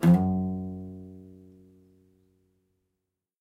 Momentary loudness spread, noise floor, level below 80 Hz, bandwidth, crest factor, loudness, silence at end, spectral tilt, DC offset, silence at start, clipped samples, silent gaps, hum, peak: 26 LU; -84 dBFS; -62 dBFS; 12.5 kHz; 18 dB; -27 LUFS; 2.1 s; -9 dB/octave; under 0.1%; 0 s; under 0.1%; none; none; -10 dBFS